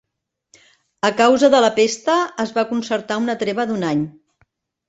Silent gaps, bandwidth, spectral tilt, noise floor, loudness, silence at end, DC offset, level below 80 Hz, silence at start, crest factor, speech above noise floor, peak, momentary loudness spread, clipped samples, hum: none; 8.2 kHz; -4 dB/octave; -79 dBFS; -18 LUFS; 0.8 s; under 0.1%; -62 dBFS; 1.05 s; 18 dB; 62 dB; -2 dBFS; 9 LU; under 0.1%; none